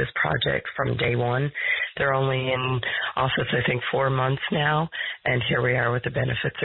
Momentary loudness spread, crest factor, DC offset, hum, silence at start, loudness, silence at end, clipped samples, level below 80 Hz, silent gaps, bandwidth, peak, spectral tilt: 3 LU; 12 dB; under 0.1%; none; 0 s; -24 LUFS; 0 s; under 0.1%; -50 dBFS; none; 4.2 kHz; -12 dBFS; -10.5 dB/octave